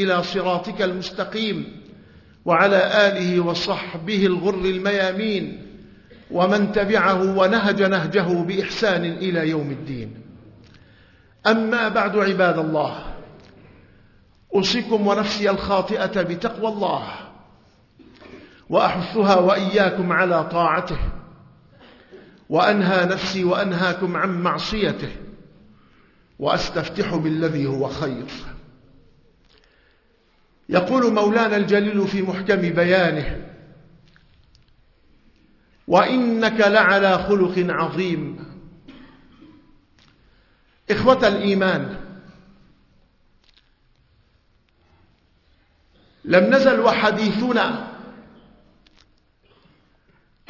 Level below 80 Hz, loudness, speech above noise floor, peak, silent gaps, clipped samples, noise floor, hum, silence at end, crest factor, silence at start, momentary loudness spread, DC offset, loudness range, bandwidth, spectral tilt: -46 dBFS; -20 LUFS; 41 dB; -2 dBFS; none; under 0.1%; -60 dBFS; none; 2.3 s; 20 dB; 0 s; 15 LU; under 0.1%; 6 LU; 6 kHz; -6 dB/octave